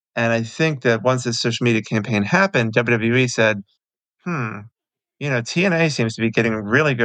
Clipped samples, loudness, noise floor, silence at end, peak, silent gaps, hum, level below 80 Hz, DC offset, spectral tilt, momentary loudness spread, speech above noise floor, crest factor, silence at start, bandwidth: under 0.1%; -19 LUFS; -69 dBFS; 0 s; -2 dBFS; none; none; -62 dBFS; under 0.1%; -5.5 dB/octave; 9 LU; 50 dB; 18 dB; 0.15 s; 9.4 kHz